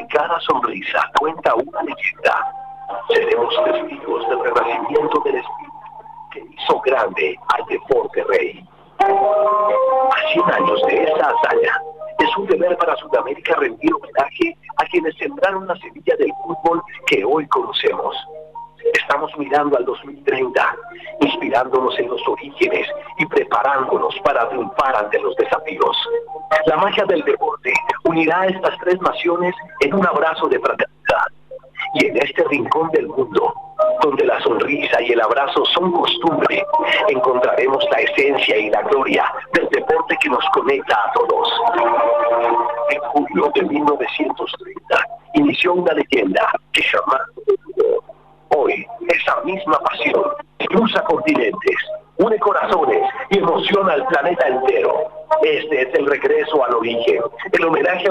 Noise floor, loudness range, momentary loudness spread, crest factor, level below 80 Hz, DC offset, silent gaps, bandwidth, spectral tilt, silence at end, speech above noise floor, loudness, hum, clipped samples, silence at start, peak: -37 dBFS; 4 LU; 7 LU; 12 dB; -56 dBFS; 0.1%; none; 11 kHz; -5 dB/octave; 0 s; 20 dB; -17 LUFS; none; under 0.1%; 0 s; -6 dBFS